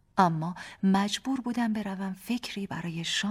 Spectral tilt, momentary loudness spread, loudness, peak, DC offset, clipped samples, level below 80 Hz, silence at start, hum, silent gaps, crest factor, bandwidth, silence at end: -5 dB/octave; 9 LU; -30 LUFS; -8 dBFS; under 0.1%; under 0.1%; -64 dBFS; 0.15 s; none; none; 22 dB; 15.5 kHz; 0 s